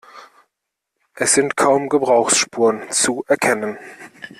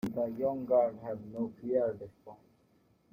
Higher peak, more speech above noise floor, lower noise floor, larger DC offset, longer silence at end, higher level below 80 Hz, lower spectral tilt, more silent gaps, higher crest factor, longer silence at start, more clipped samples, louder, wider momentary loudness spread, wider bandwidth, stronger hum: first, -2 dBFS vs -16 dBFS; first, 61 dB vs 36 dB; first, -79 dBFS vs -69 dBFS; neither; second, 0.1 s vs 0.75 s; first, -62 dBFS vs -68 dBFS; second, -2 dB/octave vs -9 dB/octave; neither; about the same, 16 dB vs 18 dB; about the same, 0.15 s vs 0.05 s; neither; first, -17 LUFS vs -33 LUFS; about the same, 13 LU vs 13 LU; about the same, 15 kHz vs 15.5 kHz; neither